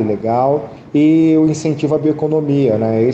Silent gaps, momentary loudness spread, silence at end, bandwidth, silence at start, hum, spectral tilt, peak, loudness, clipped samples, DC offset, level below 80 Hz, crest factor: none; 6 LU; 0 s; 8.2 kHz; 0 s; none; -8 dB/octave; -2 dBFS; -14 LUFS; under 0.1%; under 0.1%; -54 dBFS; 12 dB